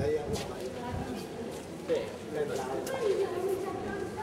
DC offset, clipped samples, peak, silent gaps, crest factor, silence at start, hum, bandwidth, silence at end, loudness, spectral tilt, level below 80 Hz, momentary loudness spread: under 0.1%; under 0.1%; -18 dBFS; none; 16 dB; 0 s; none; 16 kHz; 0 s; -34 LUFS; -5.5 dB/octave; -54 dBFS; 8 LU